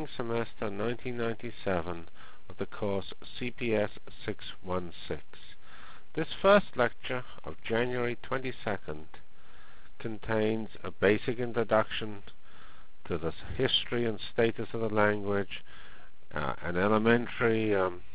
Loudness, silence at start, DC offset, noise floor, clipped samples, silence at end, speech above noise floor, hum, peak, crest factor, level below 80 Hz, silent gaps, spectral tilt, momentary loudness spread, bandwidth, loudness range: -31 LUFS; 0 s; 2%; -57 dBFS; under 0.1%; 0.05 s; 26 dB; none; -10 dBFS; 22 dB; -54 dBFS; none; -4 dB/octave; 16 LU; 4 kHz; 6 LU